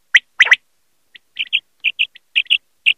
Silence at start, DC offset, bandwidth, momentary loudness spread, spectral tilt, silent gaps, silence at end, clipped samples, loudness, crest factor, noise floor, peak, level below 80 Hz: 0.15 s; under 0.1%; 14.5 kHz; 9 LU; 3.5 dB/octave; none; 0.05 s; under 0.1%; -15 LUFS; 18 dB; -67 dBFS; 0 dBFS; -72 dBFS